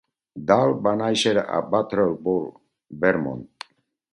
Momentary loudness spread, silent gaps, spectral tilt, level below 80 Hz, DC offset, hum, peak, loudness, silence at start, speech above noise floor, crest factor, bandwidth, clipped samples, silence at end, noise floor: 20 LU; none; -5 dB/octave; -58 dBFS; under 0.1%; none; -2 dBFS; -22 LUFS; 0.35 s; 23 dB; 22 dB; 11.5 kHz; under 0.1%; 0.7 s; -45 dBFS